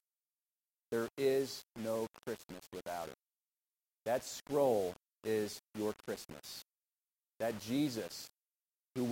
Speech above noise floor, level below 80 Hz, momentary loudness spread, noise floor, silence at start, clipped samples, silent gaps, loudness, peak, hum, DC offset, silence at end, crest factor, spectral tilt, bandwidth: over 52 dB; -76 dBFS; 14 LU; under -90 dBFS; 0.9 s; under 0.1%; none; -39 LUFS; -20 dBFS; none; under 0.1%; 0 s; 20 dB; -4.5 dB/octave; 16.5 kHz